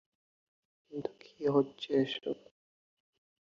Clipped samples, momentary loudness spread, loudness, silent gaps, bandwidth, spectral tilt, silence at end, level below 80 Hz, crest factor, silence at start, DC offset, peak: under 0.1%; 14 LU; -34 LUFS; none; 7.2 kHz; -7 dB/octave; 1.1 s; -76 dBFS; 22 dB; 0.9 s; under 0.1%; -16 dBFS